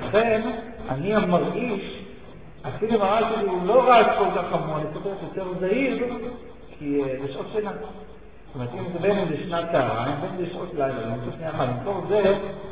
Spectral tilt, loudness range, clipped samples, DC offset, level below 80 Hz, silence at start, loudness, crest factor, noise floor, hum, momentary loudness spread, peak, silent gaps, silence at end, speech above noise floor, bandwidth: -10.5 dB/octave; 7 LU; under 0.1%; 0.6%; -50 dBFS; 0 s; -24 LUFS; 20 dB; -44 dBFS; none; 15 LU; -6 dBFS; none; 0 s; 20 dB; 4 kHz